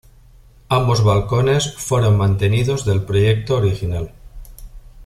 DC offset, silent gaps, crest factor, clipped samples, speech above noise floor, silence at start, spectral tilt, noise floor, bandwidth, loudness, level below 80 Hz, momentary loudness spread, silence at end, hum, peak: under 0.1%; none; 14 dB; under 0.1%; 30 dB; 0.7 s; -6 dB/octave; -46 dBFS; 14 kHz; -17 LUFS; -36 dBFS; 6 LU; 0 s; none; -2 dBFS